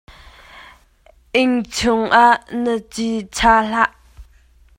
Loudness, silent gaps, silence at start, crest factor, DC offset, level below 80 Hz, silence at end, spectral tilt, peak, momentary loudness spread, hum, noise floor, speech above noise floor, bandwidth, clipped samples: -17 LUFS; none; 0.55 s; 18 dB; under 0.1%; -42 dBFS; 0.55 s; -3.5 dB/octave; 0 dBFS; 10 LU; none; -52 dBFS; 36 dB; 16 kHz; under 0.1%